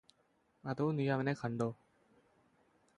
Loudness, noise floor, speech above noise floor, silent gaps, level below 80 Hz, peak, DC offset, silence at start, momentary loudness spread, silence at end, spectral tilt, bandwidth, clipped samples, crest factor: -37 LUFS; -75 dBFS; 39 dB; none; -74 dBFS; -20 dBFS; under 0.1%; 0.65 s; 13 LU; 1.25 s; -8 dB/octave; 10.5 kHz; under 0.1%; 18 dB